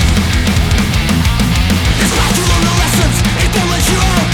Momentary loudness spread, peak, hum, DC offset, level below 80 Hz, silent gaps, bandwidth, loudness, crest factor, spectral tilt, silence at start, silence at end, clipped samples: 1 LU; 0 dBFS; none; under 0.1%; -16 dBFS; none; 19 kHz; -12 LUFS; 12 dB; -4 dB/octave; 0 s; 0 s; under 0.1%